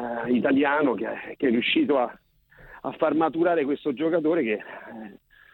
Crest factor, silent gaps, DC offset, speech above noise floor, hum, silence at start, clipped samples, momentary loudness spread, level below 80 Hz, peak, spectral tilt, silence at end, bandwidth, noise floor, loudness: 16 dB; none; under 0.1%; 27 dB; none; 0 s; under 0.1%; 16 LU; -64 dBFS; -8 dBFS; -8.5 dB/octave; 0.4 s; 4.3 kHz; -51 dBFS; -24 LUFS